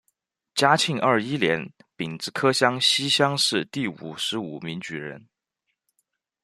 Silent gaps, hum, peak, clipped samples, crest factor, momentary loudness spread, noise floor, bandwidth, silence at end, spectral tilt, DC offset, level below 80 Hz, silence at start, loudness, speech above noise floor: none; none; -2 dBFS; under 0.1%; 22 dB; 14 LU; -80 dBFS; 13.5 kHz; 1.25 s; -3.5 dB/octave; under 0.1%; -68 dBFS; 0.55 s; -23 LUFS; 56 dB